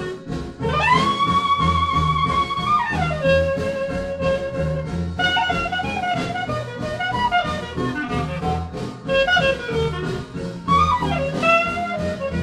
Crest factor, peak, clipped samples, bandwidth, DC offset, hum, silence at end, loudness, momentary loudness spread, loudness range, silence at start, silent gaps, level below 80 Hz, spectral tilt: 16 dB; -4 dBFS; under 0.1%; 13 kHz; under 0.1%; none; 0 s; -21 LUFS; 9 LU; 4 LU; 0 s; none; -36 dBFS; -5.5 dB/octave